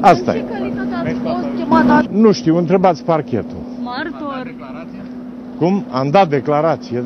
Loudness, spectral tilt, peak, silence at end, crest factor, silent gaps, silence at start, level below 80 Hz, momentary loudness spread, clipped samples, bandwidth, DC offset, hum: -16 LUFS; -7 dB/octave; 0 dBFS; 0 s; 16 dB; none; 0 s; -48 dBFS; 18 LU; under 0.1%; 7.8 kHz; under 0.1%; none